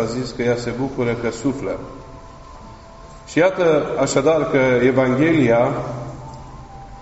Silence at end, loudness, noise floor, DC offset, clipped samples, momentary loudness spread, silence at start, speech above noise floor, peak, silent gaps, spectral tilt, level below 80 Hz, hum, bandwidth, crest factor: 0 s; -18 LUFS; -40 dBFS; under 0.1%; under 0.1%; 21 LU; 0 s; 22 dB; -2 dBFS; none; -5.5 dB/octave; -44 dBFS; none; 8 kHz; 16 dB